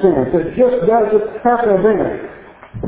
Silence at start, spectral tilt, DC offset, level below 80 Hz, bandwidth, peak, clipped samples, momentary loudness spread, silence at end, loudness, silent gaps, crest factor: 0 s; -11.5 dB/octave; under 0.1%; -42 dBFS; 4 kHz; 0 dBFS; under 0.1%; 13 LU; 0 s; -14 LUFS; none; 14 dB